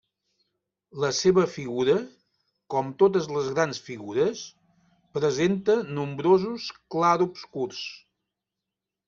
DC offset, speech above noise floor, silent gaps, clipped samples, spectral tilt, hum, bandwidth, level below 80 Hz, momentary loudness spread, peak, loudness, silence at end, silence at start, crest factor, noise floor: under 0.1%; 62 dB; none; under 0.1%; -5 dB/octave; none; 7.4 kHz; -66 dBFS; 14 LU; -6 dBFS; -25 LUFS; 1.1 s; 0.95 s; 20 dB; -87 dBFS